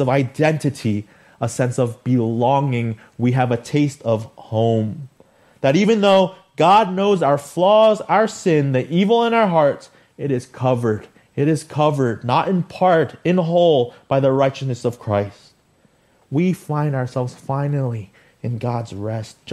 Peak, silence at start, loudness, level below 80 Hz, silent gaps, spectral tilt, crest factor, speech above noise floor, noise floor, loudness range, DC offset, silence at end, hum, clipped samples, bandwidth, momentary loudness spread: -2 dBFS; 0 s; -19 LUFS; -60 dBFS; none; -7 dB/octave; 16 dB; 40 dB; -58 dBFS; 7 LU; under 0.1%; 0 s; none; under 0.1%; 13 kHz; 11 LU